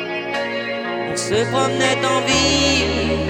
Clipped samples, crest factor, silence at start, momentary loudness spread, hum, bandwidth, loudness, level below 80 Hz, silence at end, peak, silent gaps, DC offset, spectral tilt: under 0.1%; 14 dB; 0 s; 8 LU; none; 17 kHz; -18 LUFS; -36 dBFS; 0 s; -4 dBFS; none; under 0.1%; -3.5 dB/octave